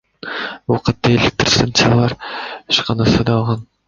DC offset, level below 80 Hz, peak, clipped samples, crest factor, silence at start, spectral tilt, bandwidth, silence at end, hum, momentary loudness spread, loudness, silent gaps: under 0.1%; -38 dBFS; 0 dBFS; under 0.1%; 16 dB; 0.25 s; -5 dB/octave; 7.6 kHz; 0.25 s; none; 13 LU; -16 LUFS; none